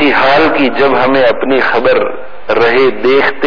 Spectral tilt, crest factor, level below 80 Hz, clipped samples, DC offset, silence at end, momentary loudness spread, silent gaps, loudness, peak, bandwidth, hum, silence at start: -6 dB/octave; 10 dB; -44 dBFS; under 0.1%; 10%; 0 s; 5 LU; none; -10 LUFS; 0 dBFS; 5.4 kHz; none; 0 s